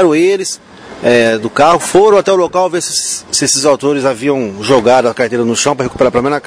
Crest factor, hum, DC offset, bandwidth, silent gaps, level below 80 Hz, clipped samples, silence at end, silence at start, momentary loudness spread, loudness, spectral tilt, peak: 12 dB; none; under 0.1%; 11 kHz; none; -46 dBFS; 0.3%; 0 s; 0 s; 6 LU; -11 LUFS; -3.5 dB/octave; 0 dBFS